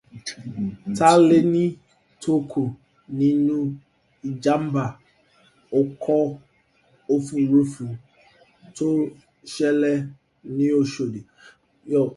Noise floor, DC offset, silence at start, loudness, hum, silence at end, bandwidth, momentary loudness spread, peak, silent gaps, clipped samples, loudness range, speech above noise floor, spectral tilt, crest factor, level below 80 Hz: -61 dBFS; under 0.1%; 0.15 s; -22 LUFS; none; 0 s; 11.5 kHz; 17 LU; -2 dBFS; none; under 0.1%; 5 LU; 40 dB; -6.5 dB/octave; 20 dB; -62 dBFS